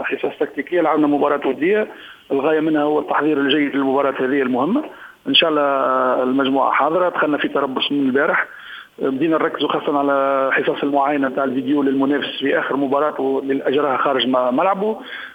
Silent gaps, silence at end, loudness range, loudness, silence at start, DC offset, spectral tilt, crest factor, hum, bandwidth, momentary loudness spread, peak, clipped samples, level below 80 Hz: none; 0 s; 2 LU; -18 LUFS; 0 s; under 0.1%; -6.5 dB/octave; 18 dB; none; 5 kHz; 6 LU; 0 dBFS; under 0.1%; -66 dBFS